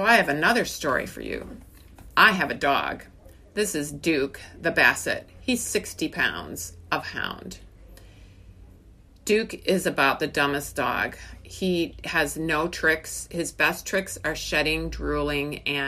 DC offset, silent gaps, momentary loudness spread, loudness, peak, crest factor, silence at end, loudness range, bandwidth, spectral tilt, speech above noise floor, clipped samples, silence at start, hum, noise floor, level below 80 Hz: under 0.1%; none; 14 LU; -25 LUFS; -2 dBFS; 24 dB; 0 s; 6 LU; 15.5 kHz; -3.5 dB/octave; 26 dB; under 0.1%; 0 s; none; -51 dBFS; -46 dBFS